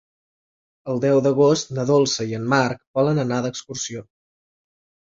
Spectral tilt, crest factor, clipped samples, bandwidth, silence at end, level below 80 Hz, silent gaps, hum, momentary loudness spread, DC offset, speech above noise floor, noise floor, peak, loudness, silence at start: -5 dB/octave; 20 dB; under 0.1%; 7.8 kHz; 1.1 s; -62 dBFS; 2.87-2.94 s; none; 11 LU; under 0.1%; over 70 dB; under -90 dBFS; -2 dBFS; -21 LUFS; 0.85 s